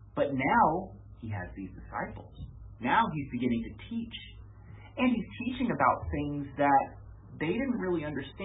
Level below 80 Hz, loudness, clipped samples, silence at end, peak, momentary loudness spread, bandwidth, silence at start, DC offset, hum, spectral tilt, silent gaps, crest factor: -50 dBFS; -30 LUFS; under 0.1%; 0 s; -12 dBFS; 21 LU; 3.9 kHz; 0 s; under 0.1%; none; -2.5 dB/octave; none; 20 dB